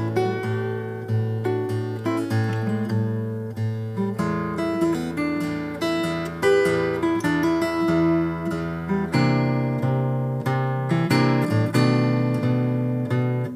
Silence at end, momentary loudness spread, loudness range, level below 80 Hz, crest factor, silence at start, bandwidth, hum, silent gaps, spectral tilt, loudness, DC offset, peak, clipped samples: 0 s; 7 LU; 4 LU; -52 dBFS; 16 dB; 0 s; 15.5 kHz; none; none; -7.5 dB/octave; -23 LUFS; under 0.1%; -6 dBFS; under 0.1%